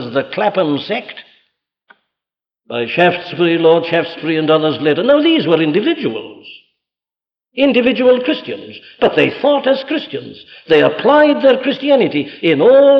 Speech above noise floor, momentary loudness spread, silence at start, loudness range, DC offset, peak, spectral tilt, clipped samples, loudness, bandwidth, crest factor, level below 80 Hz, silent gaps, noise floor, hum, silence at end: over 77 dB; 14 LU; 0 s; 4 LU; under 0.1%; -2 dBFS; -7.5 dB/octave; under 0.1%; -13 LUFS; 6 kHz; 14 dB; -60 dBFS; none; under -90 dBFS; none; 0 s